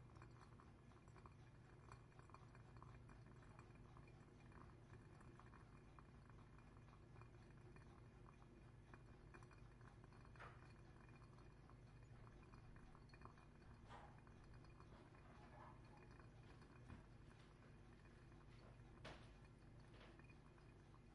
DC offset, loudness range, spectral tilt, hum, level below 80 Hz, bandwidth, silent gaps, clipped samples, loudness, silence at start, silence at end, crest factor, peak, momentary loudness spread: under 0.1%; 1 LU; -6.5 dB/octave; none; -70 dBFS; 10.5 kHz; none; under 0.1%; -66 LUFS; 0 s; 0 s; 22 dB; -42 dBFS; 3 LU